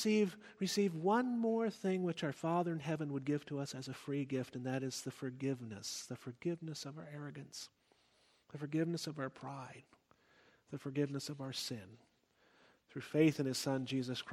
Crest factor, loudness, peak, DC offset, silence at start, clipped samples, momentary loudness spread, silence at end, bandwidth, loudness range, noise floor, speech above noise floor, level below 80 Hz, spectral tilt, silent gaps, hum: 20 dB; -39 LUFS; -18 dBFS; under 0.1%; 0 s; under 0.1%; 15 LU; 0 s; 16 kHz; 8 LU; -73 dBFS; 34 dB; -82 dBFS; -5.5 dB/octave; none; none